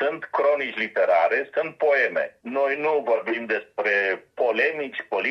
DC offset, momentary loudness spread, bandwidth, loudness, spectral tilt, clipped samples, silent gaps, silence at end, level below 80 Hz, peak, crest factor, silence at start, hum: under 0.1%; 7 LU; 6.4 kHz; -23 LUFS; -5 dB/octave; under 0.1%; none; 0 s; -78 dBFS; -8 dBFS; 14 dB; 0 s; none